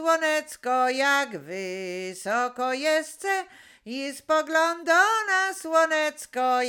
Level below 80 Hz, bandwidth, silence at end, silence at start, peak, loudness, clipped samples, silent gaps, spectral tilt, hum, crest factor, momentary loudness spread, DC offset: -76 dBFS; 18 kHz; 0 s; 0 s; -8 dBFS; -25 LUFS; under 0.1%; none; -2 dB/octave; none; 18 dB; 12 LU; under 0.1%